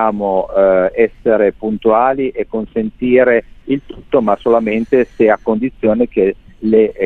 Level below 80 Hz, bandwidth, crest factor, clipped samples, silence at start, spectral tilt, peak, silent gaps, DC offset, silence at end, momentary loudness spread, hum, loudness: -42 dBFS; 4.4 kHz; 14 dB; under 0.1%; 0 s; -9 dB/octave; 0 dBFS; none; under 0.1%; 0 s; 8 LU; none; -14 LUFS